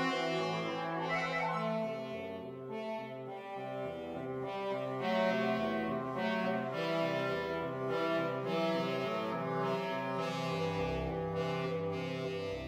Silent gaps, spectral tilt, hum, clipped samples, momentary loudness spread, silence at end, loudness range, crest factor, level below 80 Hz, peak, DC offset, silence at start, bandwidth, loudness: none; -6 dB/octave; none; under 0.1%; 8 LU; 0 s; 4 LU; 18 dB; -60 dBFS; -18 dBFS; under 0.1%; 0 s; 16 kHz; -36 LUFS